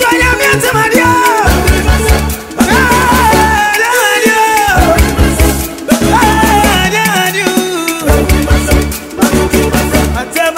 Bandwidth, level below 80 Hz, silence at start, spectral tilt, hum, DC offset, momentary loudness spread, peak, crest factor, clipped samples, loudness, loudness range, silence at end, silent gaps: 16.5 kHz; -16 dBFS; 0 s; -4 dB/octave; none; under 0.1%; 5 LU; 0 dBFS; 10 dB; 0.2%; -9 LUFS; 2 LU; 0 s; none